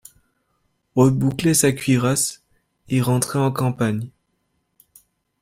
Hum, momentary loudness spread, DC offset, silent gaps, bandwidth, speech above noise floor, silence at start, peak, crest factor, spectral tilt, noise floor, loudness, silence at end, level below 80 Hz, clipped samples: none; 8 LU; under 0.1%; none; 16 kHz; 52 dB; 0.95 s; -4 dBFS; 18 dB; -5 dB/octave; -71 dBFS; -20 LUFS; 1.35 s; -54 dBFS; under 0.1%